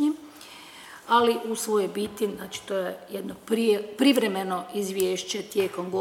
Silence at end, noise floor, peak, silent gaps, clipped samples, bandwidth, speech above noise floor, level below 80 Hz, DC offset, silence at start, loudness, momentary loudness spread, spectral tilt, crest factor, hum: 0 s; -46 dBFS; -8 dBFS; none; under 0.1%; 18.5 kHz; 20 dB; -68 dBFS; under 0.1%; 0 s; -26 LUFS; 18 LU; -4 dB/octave; 18 dB; none